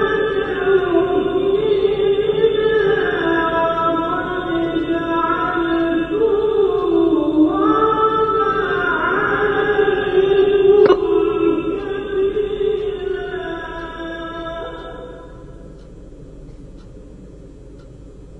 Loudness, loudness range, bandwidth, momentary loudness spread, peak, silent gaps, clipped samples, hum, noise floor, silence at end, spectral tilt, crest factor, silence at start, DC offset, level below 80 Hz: -17 LUFS; 15 LU; 6 kHz; 13 LU; 0 dBFS; none; under 0.1%; none; -38 dBFS; 0 s; -7.5 dB/octave; 18 dB; 0 s; under 0.1%; -40 dBFS